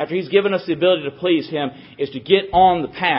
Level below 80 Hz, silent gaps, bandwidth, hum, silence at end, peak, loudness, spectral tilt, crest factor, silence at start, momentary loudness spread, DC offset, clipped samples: -50 dBFS; none; 5.8 kHz; none; 0 s; 0 dBFS; -18 LUFS; -10.5 dB/octave; 18 dB; 0 s; 12 LU; under 0.1%; under 0.1%